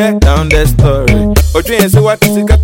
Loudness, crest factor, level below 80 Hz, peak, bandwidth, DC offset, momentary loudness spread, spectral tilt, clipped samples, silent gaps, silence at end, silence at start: -9 LUFS; 8 dB; -12 dBFS; 0 dBFS; 17 kHz; under 0.1%; 2 LU; -6 dB/octave; 0.4%; none; 0 s; 0 s